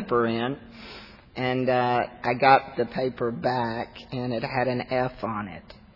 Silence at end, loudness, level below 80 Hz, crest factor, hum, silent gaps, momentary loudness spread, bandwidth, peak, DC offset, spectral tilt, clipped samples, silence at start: 0.2 s; -26 LUFS; -56 dBFS; 22 dB; none; none; 19 LU; 6 kHz; -4 dBFS; under 0.1%; -8 dB/octave; under 0.1%; 0 s